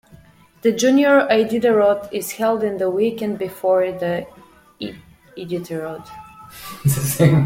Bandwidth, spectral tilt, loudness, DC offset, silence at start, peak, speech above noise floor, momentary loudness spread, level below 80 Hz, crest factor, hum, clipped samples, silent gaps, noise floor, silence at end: 16.5 kHz; -6 dB/octave; -19 LUFS; under 0.1%; 0.65 s; -2 dBFS; 30 dB; 20 LU; -54 dBFS; 16 dB; none; under 0.1%; none; -48 dBFS; 0 s